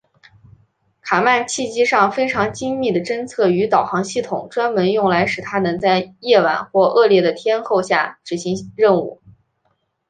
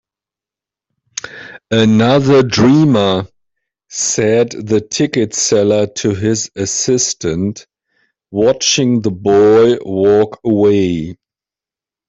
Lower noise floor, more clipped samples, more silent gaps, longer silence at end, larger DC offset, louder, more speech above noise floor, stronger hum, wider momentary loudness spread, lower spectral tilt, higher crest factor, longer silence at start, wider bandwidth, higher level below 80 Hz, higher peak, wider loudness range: second, -67 dBFS vs -89 dBFS; neither; neither; about the same, 0.95 s vs 0.95 s; neither; second, -17 LUFS vs -13 LUFS; second, 50 dB vs 77 dB; neither; second, 9 LU vs 15 LU; about the same, -4.5 dB/octave vs -4.5 dB/octave; about the same, 16 dB vs 12 dB; second, 1.05 s vs 1.25 s; first, 9.6 kHz vs 8.4 kHz; second, -58 dBFS vs -48 dBFS; about the same, -2 dBFS vs -2 dBFS; about the same, 2 LU vs 3 LU